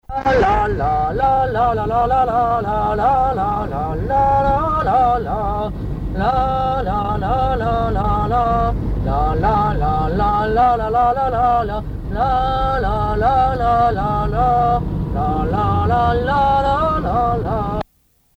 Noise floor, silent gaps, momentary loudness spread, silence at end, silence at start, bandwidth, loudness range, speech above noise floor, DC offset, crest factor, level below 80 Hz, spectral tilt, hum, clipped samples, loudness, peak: -59 dBFS; none; 6 LU; 0.55 s; 0.1 s; 8.4 kHz; 2 LU; 42 dB; under 0.1%; 12 dB; -26 dBFS; -8 dB/octave; none; under 0.1%; -17 LUFS; -4 dBFS